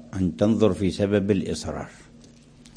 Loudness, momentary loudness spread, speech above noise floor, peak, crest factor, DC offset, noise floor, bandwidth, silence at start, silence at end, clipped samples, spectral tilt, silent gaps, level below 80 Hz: -23 LUFS; 13 LU; 27 dB; -6 dBFS; 18 dB; under 0.1%; -50 dBFS; 10.5 kHz; 0 s; 0.1 s; under 0.1%; -7 dB/octave; none; -50 dBFS